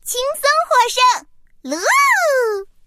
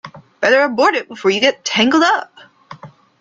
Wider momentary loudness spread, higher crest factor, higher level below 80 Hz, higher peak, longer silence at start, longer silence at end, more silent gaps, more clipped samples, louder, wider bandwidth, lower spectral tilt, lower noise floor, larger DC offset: first, 9 LU vs 6 LU; about the same, 14 dB vs 16 dB; first, -54 dBFS vs -62 dBFS; about the same, -2 dBFS vs -2 dBFS; about the same, 0.05 s vs 0.05 s; second, 0.2 s vs 0.35 s; neither; neither; about the same, -15 LUFS vs -14 LUFS; first, 15.5 kHz vs 7.8 kHz; second, 1.5 dB/octave vs -3 dB/octave; about the same, -38 dBFS vs -40 dBFS; neither